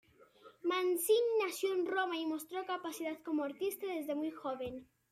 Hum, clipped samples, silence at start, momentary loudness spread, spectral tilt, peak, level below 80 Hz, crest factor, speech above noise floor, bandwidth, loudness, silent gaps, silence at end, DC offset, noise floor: none; under 0.1%; 0.2 s; 10 LU; -2.5 dB/octave; -20 dBFS; -76 dBFS; 16 dB; 25 dB; 16 kHz; -36 LUFS; none; 0.3 s; under 0.1%; -61 dBFS